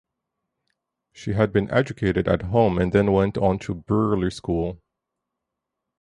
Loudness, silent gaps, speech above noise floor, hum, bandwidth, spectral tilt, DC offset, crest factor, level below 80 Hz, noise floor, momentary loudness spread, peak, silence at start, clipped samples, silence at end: -22 LUFS; none; 62 dB; none; 11 kHz; -8 dB/octave; under 0.1%; 20 dB; -42 dBFS; -83 dBFS; 8 LU; -4 dBFS; 1.15 s; under 0.1%; 1.25 s